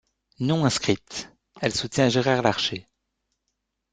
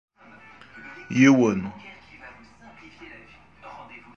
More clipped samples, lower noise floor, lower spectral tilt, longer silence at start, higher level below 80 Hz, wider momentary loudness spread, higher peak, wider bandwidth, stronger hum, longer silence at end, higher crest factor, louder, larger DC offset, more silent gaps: neither; first, -79 dBFS vs -50 dBFS; second, -4.5 dB/octave vs -6 dB/octave; second, 0.4 s vs 0.75 s; about the same, -58 dBFS vs -60 dBFS; second, 15 LU vs 28 LU; about the same, -2 dBFS vs -4 dBFS; first, 9.4 kHz vs 7.2 kHz; neither; first, 1.1 s vs 0.2 s; about the same, 22 dB vs 22 dB; second, -24 LUFS vs -20 LUFS; neither; neither